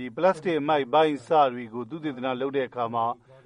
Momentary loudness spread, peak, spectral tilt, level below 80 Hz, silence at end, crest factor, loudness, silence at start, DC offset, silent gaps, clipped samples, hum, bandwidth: 11 LU; -8 dBFS; -6.5 dB/octave; -70 dBFS; 0.3 s; 18 dB; -26 LUFS; 0 s; under 0.1%; none; under 0.1%; none; 10.5 kHz